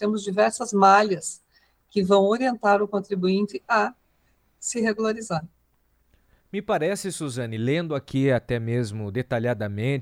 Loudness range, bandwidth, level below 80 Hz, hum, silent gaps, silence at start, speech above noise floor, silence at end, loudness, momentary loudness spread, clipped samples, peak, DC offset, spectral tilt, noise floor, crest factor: 7 LU; 16 kHz; -58 dBFS; none; none; 0 s; 43 dB; 0 s; -24 LUFS; 11 LU; under 0.1%; -4 dBFS; under 0.1%; -5.5 dB/octave; -66 dBFS; 20 dB